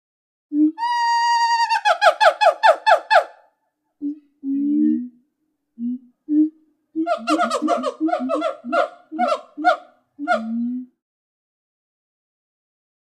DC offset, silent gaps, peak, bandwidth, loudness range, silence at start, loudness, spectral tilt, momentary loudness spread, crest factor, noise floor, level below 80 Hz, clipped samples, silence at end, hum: under 0.1%; none; 0 dBFS; 12 kHz; 8 LU; 0.5 s; -19 LUFS; -3 dB/octave; 16 LU; 20 dB; -73 dBFS; -78 dBFS; under 0.1%; 2.2 s; none